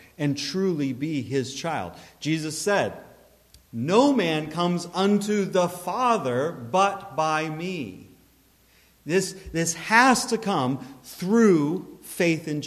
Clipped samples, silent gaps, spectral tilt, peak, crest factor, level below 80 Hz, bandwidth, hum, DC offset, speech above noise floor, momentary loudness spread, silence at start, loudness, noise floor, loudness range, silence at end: under 0.1%; none; -4.5 dB/octave; -4 dBFS; 22 dB; -58 dBFS; 14.5 kHz; none; under 0.1%; 35 dB; 14 LU; 0.2 s; -24 LUFS; -59 dBFS; 5 LU; 0 s